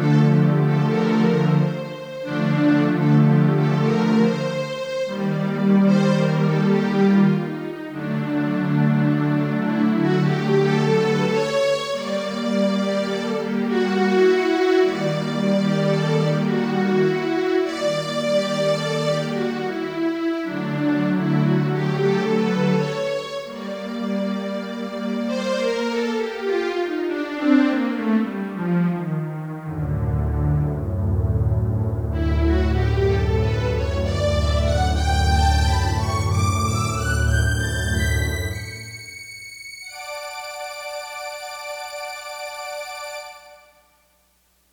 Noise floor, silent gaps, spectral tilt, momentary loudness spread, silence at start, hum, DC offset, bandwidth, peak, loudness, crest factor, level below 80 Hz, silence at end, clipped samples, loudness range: -62 dBFS; none; -6.5 dB/octave; 13 LU; 0 s; none; under 0.1%; 19.5 kHz; -6 dBFS; -21 LUFS; 14 dB; -32 dBFS; 1.15 s; under 0.1%; 7 LU